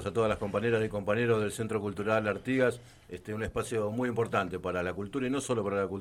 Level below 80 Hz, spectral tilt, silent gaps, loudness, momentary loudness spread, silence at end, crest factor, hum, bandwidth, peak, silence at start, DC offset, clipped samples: -56 dBFS; -6 dB/octave; none; -31 LUFS; 6 LU; 0 s; 18 dB; none; 15.5 kHz; -12 dBFS; 0 s; under 0.1%; under 0.1%